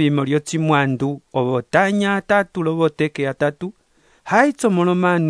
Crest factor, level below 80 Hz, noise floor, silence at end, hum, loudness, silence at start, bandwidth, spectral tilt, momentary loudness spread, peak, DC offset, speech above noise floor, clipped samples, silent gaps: 18 dB; -60 dBFS; -45 dBFS; 0 s; none; -18 LUFS; 0 s; 11 kHz; -6.5 dB/octave; 6 LU; 0 dBFS; under 0.1%; 27 dB; under 0.1%; none